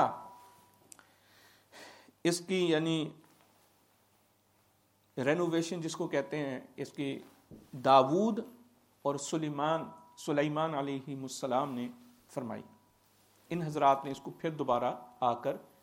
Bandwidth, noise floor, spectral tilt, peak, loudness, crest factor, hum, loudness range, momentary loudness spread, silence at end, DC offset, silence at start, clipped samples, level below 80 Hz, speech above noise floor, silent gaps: 16.5 kHz; -70 dBFS; -5.5 dB/octave; -10 dBFS; -33 LUFS; 24 dB; none; 5 LU; 17 LU; 0.2 s; under 0.1%; 0 s; under 0.1%; -78 dBFS; 38 dB; none